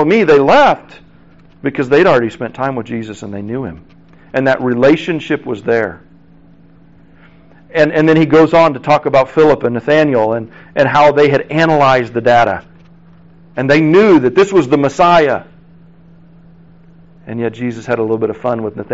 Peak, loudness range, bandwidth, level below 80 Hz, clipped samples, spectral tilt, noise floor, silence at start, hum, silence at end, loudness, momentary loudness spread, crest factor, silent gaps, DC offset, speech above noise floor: 0 dBFS; 6 LU; 8 kHz; -48 dBFS; under 0.1%; -5 dB/octave; -44 dBFS; 0 s; none; 0 s; -12 LUFS; 14 LU; 12 dB; none; 0.5%; 33 dB